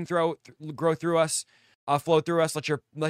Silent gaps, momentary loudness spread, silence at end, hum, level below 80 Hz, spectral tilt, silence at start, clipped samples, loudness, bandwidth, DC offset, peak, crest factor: 1.75-1.87 s; 16 LU; 0 s; none; -70 dBFS; -4.5 dB/octave; 0 s; under 0.1%; -26 LUFS; 15.5 kHz; under 0.1%; -8 dBFS; 18 dB